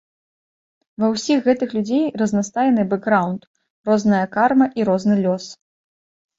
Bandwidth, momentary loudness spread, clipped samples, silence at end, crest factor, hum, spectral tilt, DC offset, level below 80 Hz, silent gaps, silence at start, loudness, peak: 7.8 kHz; 7 LU; under 0.1%; 0.85 s; 18 dB; none; -6 dB/octave; under 0.1%; -62 dBFS; 3.47-3.54 s, 3.70-3.84 s; 1 s; -19 LUFS; -2 dBFS